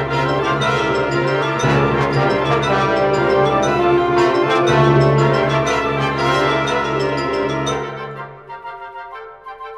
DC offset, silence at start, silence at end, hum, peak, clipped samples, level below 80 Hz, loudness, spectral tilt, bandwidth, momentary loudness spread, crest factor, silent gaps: under 0.1%; 0 s; 0 s; none; -2 dBFS; under 0.1%; -40 dBFS; -16 LUFS; -6 dB/octave; 10.5 kHz; 18 LU; 14 dB; none